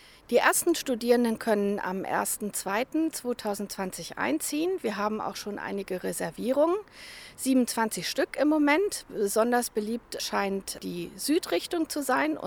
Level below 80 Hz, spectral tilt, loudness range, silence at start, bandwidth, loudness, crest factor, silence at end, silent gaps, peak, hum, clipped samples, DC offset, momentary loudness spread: -62 dBFS; -3.5 dB/octave; 4 LU; 0.3 s; over 20 kHz; -28 LUFS; 20 dB; 0 s; none; -8 dBFS; none; under 0.1%; under 0.1%; 10 LU